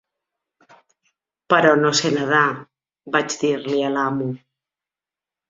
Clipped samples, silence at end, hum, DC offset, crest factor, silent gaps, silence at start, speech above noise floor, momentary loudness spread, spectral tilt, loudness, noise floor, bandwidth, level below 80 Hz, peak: under 0.1%; 1.1 s; none; under 0.1%; 20 dB; none; 1.5 s; 71 dB; 11 LU; -4 dB/octave; -19 LUFS; -90 dBFS; 7.8 kHz; -66 dBFS; -2 dBFS